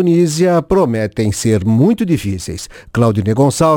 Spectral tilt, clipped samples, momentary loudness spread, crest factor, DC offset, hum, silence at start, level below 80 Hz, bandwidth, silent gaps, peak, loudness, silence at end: -6.5 dB/octave; under 0.1%; 10 LU; 12 dB; under 0.1%; none; 0 s; -40 dBFS; 18 kHz; none; 0 dBFS; -14 LUFS; 0 s